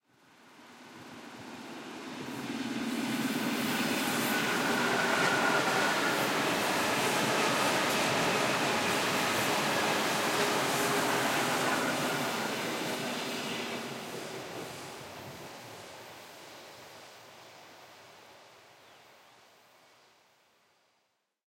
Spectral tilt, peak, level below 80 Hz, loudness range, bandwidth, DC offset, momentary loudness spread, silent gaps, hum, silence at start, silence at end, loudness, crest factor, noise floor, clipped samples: -3 dB/octave; -16 dBFS; -74 dBFS; 18 LU; 16.5 kHz; under 0.1%; 20 LU; none; none; 0.55 s; 3 s; -30 LUFS; 18 dB; -78 dBFS; under 0.1%